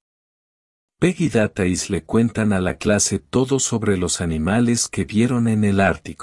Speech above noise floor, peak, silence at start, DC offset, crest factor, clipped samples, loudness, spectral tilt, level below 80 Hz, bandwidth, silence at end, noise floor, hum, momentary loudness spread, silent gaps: over 71 dB; -2 dBFS; 1 s; under 0.1%; 18 dB; under 0.1%; -19 LUFS; -5 dB/octave; -46 dBFS; 12 kHz; 0 s; under -90 dBFS; none; 3 LU; none